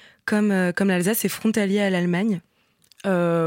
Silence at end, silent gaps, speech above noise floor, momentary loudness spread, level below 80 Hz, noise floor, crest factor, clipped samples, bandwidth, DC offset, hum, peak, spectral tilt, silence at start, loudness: 0 s; none; 38 dB; 5 LU; -68 dBFS; -59 dBFS; 12 dB; under 0.1%; 17 kHz; under 0.1%; none; -10 dBFS; -5.5 dB/octave; 0.25 s; -22 LUFS